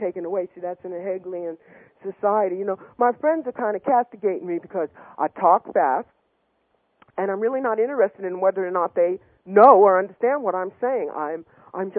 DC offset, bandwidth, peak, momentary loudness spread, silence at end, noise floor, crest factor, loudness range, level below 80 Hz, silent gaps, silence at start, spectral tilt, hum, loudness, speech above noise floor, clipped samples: under 0.1%; 4.3 kHz; 0 dBFS; 14 LU; 0 s; -69 dBFS; 22 dB; 6 LU; -76 dBFS; none; 0 s; -10.5 dB/octave; none; -22 LUFS; 48 dB; under 0.1%